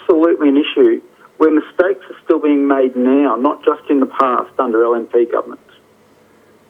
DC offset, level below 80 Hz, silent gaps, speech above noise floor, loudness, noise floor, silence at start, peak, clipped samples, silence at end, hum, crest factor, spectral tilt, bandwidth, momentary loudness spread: under 0.1%; -64 dBFS; none; 36 dB; -14 LUFS; -50 dBFS; 0.1 s; 0 dBFS; under 0.1%; 1.15 s; none; 14 dB; -6.5 dB/octave; 3.9 kHz; 5 LU